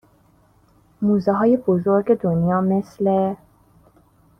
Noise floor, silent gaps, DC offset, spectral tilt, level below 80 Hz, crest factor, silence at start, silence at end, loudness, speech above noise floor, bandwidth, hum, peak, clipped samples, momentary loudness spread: -56 dBFS; none; under 0.1%; -10.5 dB/octave; -56 dBFS; 16 dB; 1 s; 1.05 s; -19 LUFS; 38 dB; 6.4 kHz; none; -6 dBFS; under 0.1%; 5 LU